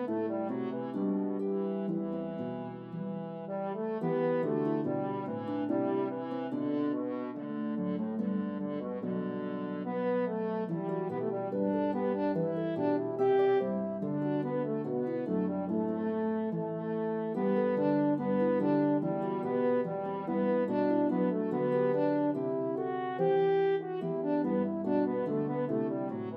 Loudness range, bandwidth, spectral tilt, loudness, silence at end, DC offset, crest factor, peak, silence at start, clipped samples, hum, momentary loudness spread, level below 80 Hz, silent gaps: 5 LU; 5.2 kHz; -10.5 dB/octave; -32 LUFS; 0 s; under 0.1%; 14 dB; -18 dBFS; 0 s; under 0.1%; none; 8 LU; -82 dBFS; none